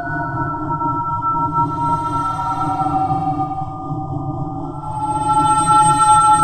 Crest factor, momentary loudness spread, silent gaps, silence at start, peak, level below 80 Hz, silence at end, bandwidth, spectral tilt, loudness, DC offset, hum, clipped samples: 16 dB; 14 LU; none; 0 s; -2 dBFS; -40 dBFS; 0 s; 13.5 kHz; -4.5 dB/octave; -18 LUFS; under 0.1%; none; under 0.1%